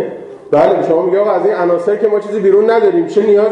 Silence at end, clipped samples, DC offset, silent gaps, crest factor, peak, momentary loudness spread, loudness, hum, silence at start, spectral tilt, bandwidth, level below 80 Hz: 0 s; under 0.1%; under 0.1%; none; 10 dB; -2 dBFS; 4 LU; -12 LUFS; none; 0 s; -7.5 dB/octave; 8 kHz; -58 dBFS